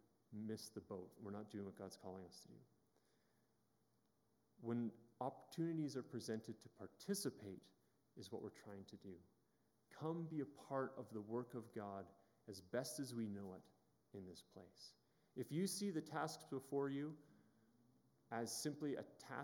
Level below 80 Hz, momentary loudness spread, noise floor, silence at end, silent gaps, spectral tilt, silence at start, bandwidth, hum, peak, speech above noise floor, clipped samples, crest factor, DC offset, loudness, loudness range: under -90 dBFS; 16 LU; -82 dBFS; 0 s; none; -5 dB/octave; 0.3 s; 17.5 kHz; none; -30 dBFS; 33 dB; under 0.1%; 20 dB; under 0.1%; -49 LUFS; 7 LU